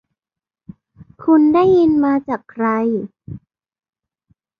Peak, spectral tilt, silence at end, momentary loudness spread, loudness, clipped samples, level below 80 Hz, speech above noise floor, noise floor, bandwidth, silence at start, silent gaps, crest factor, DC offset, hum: -4 dBFS; -9 dB/octave; 1.2 s; 23 LU; -16 LUFS; under 0.1%; -54 dBFS; 75 dB; -89 dBFS; 5.2 kHz; 1 s; none; 14 dB; under 0.1%; none